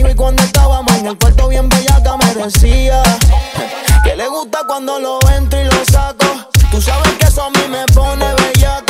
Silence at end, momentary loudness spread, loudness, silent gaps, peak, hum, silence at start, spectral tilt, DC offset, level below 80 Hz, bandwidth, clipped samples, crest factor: 0.05 s; 7 LU; -12 LUFS; none; 0 dBFS; none; 0 s; -4.5 dB/octave; under 0.1%; -12 dBFS; 16.5 kHz; under 0.1%; 10 dB